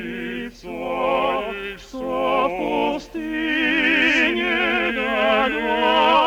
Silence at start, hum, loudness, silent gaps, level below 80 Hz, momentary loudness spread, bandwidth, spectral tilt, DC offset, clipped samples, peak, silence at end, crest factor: 0 s; none; -20 LUFS; none; -48 dBFS; 14 LU; over 20 kHz; -4 dB/octave; under 0.1%; under 0.1%; -4 dBFS; 0 s; 16 dB